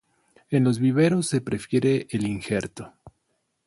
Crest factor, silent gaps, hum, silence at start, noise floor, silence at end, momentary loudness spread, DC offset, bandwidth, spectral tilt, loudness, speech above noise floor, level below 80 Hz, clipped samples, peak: 16 dB; none; none; 0.5 s; -74 dBFS; 0.55 s; 11 LU; under 0.1%; 11.5 kHz; -6.5 dB/octave; -24 LUFS; 51 dB; -58 dBFS; under 0.1%; -8 dBFS